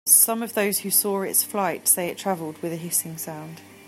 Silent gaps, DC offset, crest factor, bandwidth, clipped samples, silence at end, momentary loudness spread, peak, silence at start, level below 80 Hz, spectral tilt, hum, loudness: none; under 0.1%; 22 dB; 16 kHz; under 0.1%; 0 s; 14 LU; -2 dBFS; 0.05 s; -74 dBFS; -2.5 dB/octave; none; -21 LUFS